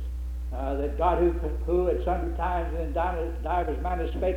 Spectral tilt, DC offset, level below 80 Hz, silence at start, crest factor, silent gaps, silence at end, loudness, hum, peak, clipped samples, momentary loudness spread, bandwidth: -8.5 dB/octave; under 0.1%; -30 dBFS; 0 s; 16 dB; none; 0 s; -28 LUFS; none; -10 dBFS; under 0.1%; 7 LU; 4.5 kHz